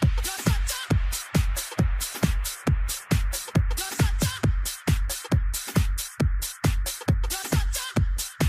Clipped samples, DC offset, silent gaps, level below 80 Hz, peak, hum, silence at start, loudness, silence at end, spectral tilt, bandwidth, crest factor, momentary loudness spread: under 0.1%; under 0.1%; none; -28 dBFS; -8 dBFS; none; 0 s; -26 LUFS; 0 s; -4.5 dB/octave; 16 kHz; 16 dB; 2 LU